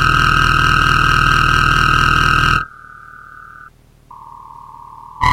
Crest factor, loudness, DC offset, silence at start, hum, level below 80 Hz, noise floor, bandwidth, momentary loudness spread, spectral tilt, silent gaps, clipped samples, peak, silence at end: 16 dB; -12 LUFS; under 0.1%; 0 s; none; -26 dBFS; -43 dBFS; 16.5 kHz; 5 LU; -4 dB/octave; none; under 0.1%; 0 dBFS; 0 s